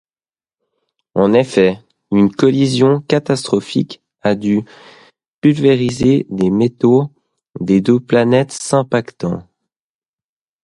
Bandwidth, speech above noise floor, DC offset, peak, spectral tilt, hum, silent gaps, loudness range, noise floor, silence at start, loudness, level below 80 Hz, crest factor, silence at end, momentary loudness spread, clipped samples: 11.5 kHz; over 76 dB; under 0.1%; 0 dBFS; -6.5 dB/octave; none; 5.28-5.42 s; 2 LU; under -90 dBFS; 1.15 s; -15 LUFS; -50 dBFS; 16 dB; 1.2 s; 10 LU; under 0.1%